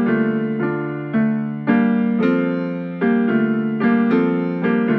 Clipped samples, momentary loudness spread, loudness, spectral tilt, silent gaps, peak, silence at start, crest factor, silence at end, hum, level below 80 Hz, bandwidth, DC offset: under 0.1%; 6 LU; -19 LUFS; -10 dB/octave; none; -4 dBFS; 0 s; 14 dB; 0 s; none; -64 dBFS; 4.6 kHz; under 0.1%